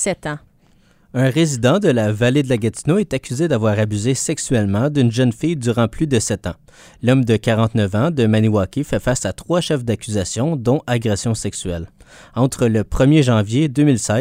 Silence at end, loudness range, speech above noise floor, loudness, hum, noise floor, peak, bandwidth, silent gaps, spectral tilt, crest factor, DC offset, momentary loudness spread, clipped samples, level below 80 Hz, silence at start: 0 s; 3 LU; 36 dB; -18 LUFS; none; -53 dBFS; -2 dBFS; 16 kHz; none; -6 dB/octave; 16 dB; under 0.1%; 7 LU; under 0.1%; -40 dBFS; 0 s